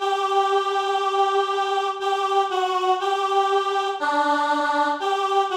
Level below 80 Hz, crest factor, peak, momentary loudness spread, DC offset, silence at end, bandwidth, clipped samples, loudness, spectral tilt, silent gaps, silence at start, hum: -72 dBFS; 12 dB; -10 dBFS; 3 LU; under 0.1%; 0 s; 15 kHz; under 0.1%; -22 LUFS; -1 dB/octave; none; 0 s; none